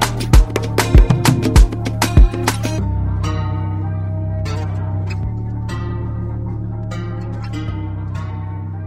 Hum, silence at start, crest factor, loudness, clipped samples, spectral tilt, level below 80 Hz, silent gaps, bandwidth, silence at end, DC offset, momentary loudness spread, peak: none; 0 s; 16 dB; -19 LUFS; under 0.1%; -5.5 dB/octave; -18 dBFS; none; 15.5 kHz; 0 s; under 0.1%; 11 LU; 0 dBFS